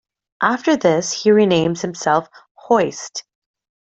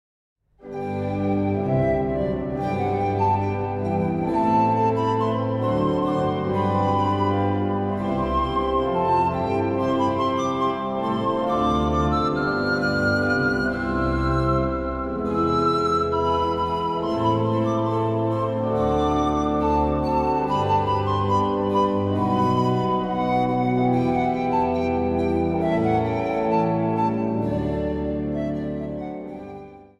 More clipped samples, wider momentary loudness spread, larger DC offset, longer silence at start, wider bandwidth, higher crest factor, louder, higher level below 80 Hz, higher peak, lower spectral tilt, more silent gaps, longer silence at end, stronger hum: neither; first, 10 LU vs 5 LU; neither; second, 0.4 s vs 0.6 s; second, 8.2 kHz vs 11.5 kHz; about the same, 16 dB vs 14 dB; first, -17 LUFS vs -22 LUFS; second, -60 dBFS vs -38 dBFS; first, -2 dBFS vs -8 dBFS; second, -4.5 dB/octave vs -8 dB/octave; first, 2.51-2.55 s vs none; first, 0.7 s vs 0.15 s; neither